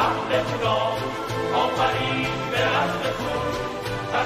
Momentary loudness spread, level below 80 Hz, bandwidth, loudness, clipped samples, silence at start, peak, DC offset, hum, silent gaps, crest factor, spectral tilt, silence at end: 6 LU; -46 dBFS; 15.5 kHz; -24 LUFS; under 0.1%; 0 s; -8 dBFS; under 0.1%; none; none; 16 dB; -5 dB/octave; 0 s